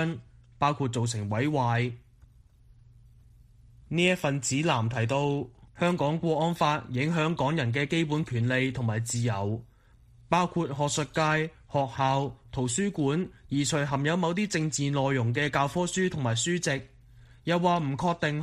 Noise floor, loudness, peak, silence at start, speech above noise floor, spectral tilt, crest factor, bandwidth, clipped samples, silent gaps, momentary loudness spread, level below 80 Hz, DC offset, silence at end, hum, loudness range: -57 dBFS; -28 LUFS; -10 dBFS; 0 s; 30 dB; -5 dB/octave; 18 dB; 14 kHz; under 0.1%; none; 6 LU; -56 dBFS; under 0.1%; 0 s; none; 3 LU